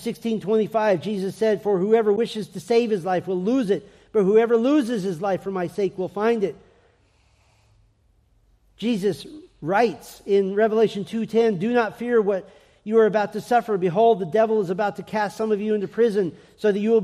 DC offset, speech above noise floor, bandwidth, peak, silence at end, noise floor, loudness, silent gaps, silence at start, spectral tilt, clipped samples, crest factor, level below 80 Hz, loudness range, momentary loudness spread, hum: under 0.1%; 40 dB; 13.5 kHz; -6 dBFS; 0 s; -61 dBFS; -22 LUFS; none; 0 s; -6.5 dB/octave; under 0.1%; 16 dB; -64 dBFS; 7 LU; 8 LU; none